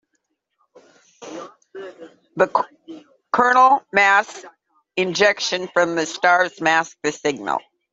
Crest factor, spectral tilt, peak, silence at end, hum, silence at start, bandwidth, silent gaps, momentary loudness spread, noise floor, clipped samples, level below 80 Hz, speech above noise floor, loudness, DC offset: 20 dB; -3 dB/octave; 0 dBFS; 0.35 s; none; 1.2 s; 8 kHz; none; 22 LU; -73 dBFS; under 0.1%; -68 dBFS; 55 dB; -18 LUFS; under 0.1%